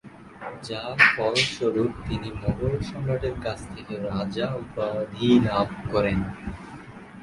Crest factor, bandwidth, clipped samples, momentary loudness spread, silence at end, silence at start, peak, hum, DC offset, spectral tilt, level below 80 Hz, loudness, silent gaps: 24 dB; 11.5 kHz; under 0.1%; 19 LU; 0 s; 0.05 s; -2 dBFS; none; under 0.1%; -5.5 dB/octave; -44 dBFS; -25 LUFS; none